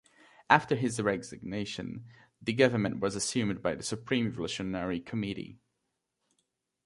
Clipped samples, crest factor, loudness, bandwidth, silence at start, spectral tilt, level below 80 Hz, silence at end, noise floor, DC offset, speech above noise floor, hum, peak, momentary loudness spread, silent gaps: under 0.1%; 28 dB; -31 LUFS; 11.5 kHz; 0.5 s; -4.5 dB/octave; -62 dBFS; 1.3 s; -83 dBFS; under 0.1%; 52 dB; none; -4 dBFS; 13 LU; none